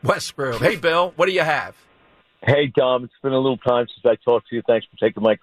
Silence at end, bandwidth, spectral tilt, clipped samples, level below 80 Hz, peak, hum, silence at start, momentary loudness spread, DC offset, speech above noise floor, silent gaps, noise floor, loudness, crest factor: 0.05 s; 14 kHz; -5.5 dB/octave; under 0.1%; -54 dBFS; -4 dBFS; none; 0.05 s; 5 LU; under 0.1%; 37 dB; none; -57 dBFS; -20 LUFS; 16 dB